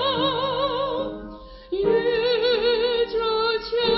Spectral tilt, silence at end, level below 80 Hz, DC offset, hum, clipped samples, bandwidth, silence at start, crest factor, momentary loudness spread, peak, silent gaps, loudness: -8 dB/octave; 0 s; -48 dBFS; under 0.1%; none; under 0.1%; 5.8 kHz; 0 s; 14 dB; 11 LU; -8 dBFS; none; -23 LUFS